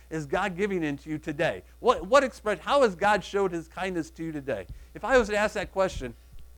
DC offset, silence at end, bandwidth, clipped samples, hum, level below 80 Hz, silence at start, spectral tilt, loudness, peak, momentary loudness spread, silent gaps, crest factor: under 0.1%; 0.05 s; 18.5 kHz; under 0.1%; none; -48 dBFS; 0.1 s; -5 dB/octave; -27 LUFS; -6 dBFS; 12 LU; none; 20 dB